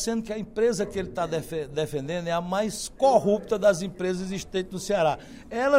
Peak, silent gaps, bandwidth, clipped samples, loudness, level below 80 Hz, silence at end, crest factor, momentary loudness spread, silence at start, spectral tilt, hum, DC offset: -8 dBFS; none; 16 kHz; under 0.1%; -27 LUFS; -50 dBFS; 0 s; 18 dB; 9 LU; 0 s; -5 dB/octave; none; under 0.1%